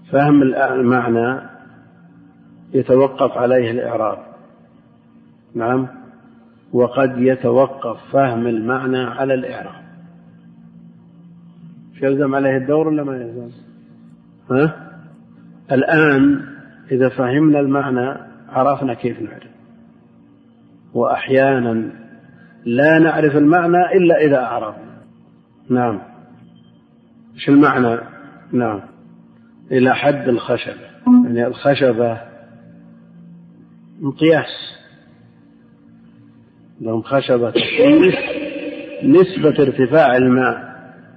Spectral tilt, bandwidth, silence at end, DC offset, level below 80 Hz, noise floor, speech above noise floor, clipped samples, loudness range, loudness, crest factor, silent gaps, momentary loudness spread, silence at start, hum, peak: -9.5 dB/octave; 5 kHz; 0.3 s; under 0.1%; -58 dBFS; -49 dBFS; 34 dB; under 0.1%; 8 LU; -16 LUFS; 16 dB; none; 16 LU; 0.1 s; none; -2 dBFS